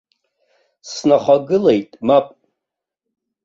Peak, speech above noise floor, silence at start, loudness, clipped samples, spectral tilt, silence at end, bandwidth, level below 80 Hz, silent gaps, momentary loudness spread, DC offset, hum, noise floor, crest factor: -2 dBFS; 68 dB; 0.85 s; -16 LUFS; under 0.1%; -6 dB/octave; 1.2 s; 7.6 kHz; -60 dBFS; none; 11 LU; under 0.1%; none; -83 dBFS; 16 dB